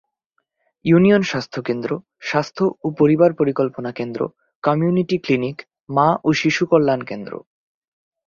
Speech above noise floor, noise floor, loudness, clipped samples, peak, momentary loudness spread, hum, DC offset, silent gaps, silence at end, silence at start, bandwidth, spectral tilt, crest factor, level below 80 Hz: 54 dB; -72 dBFS; -19 LUFS; under 0.1%; -2 dBFS; 13 LU; none; under 0.1%; 4.55-4.62 s; 0.9 s; 0.85 s; 7.4 kHz; -7 dB/octave; 18 dB; -58 dBFS